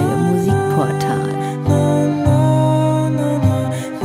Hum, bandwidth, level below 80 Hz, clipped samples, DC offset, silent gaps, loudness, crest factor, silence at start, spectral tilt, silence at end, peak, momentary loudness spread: none; 15 kHz; -40 dBFS; under 0.1%; under 0.1%; none; -16 LUFS; 12 dB; 0 s; -7.5 dB/octave; 0 s; -2 dBFS; 6 LU